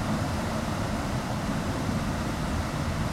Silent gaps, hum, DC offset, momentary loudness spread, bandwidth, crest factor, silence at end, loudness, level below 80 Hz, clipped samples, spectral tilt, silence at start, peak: none; none; under 0.1%; 1 LU; 16 kHz; 14 dB; 0 s; -30 LUFS; -38 dBFS; under 0.1%; -5.5 dB/octave; 0 s; -14 dBFS